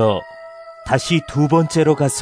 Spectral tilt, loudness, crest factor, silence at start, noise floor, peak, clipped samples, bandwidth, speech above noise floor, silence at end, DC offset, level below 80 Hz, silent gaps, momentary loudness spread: -5.5 dB/octave; -17 LUFS; 16 dB; 0 s; -37 dBFS; -2 dBFS; under 0.1%; 11 kHz; 21 dB; 0 s; under 0.1%; -46 dBFS; none; 21 LU